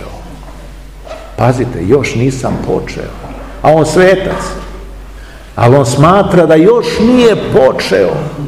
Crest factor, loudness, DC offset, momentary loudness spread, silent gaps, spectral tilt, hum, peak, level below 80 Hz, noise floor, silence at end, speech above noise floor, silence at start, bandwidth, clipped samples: 10 dB; -9 LUFS; 0.6%; 21 LU; none; -6.5 dB/octave; none; 0 dBFS; -30 dBFS; -29 dBFS; 0 s; 21 dB; 0 s; 15.5 kHz; 2%